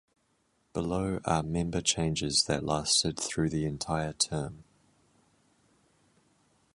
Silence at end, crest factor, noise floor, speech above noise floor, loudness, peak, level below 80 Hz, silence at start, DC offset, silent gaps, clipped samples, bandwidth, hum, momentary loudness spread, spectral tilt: 2.1 s; 22 dB; -73 dBFS; 42 dB; -29 LUFS; -12 dBFS; -50 dBFS; 0.75 s; under 0.1%; none; under 0.1%; 11.5 kHz; none; 7 LU; -3.5 dB/octave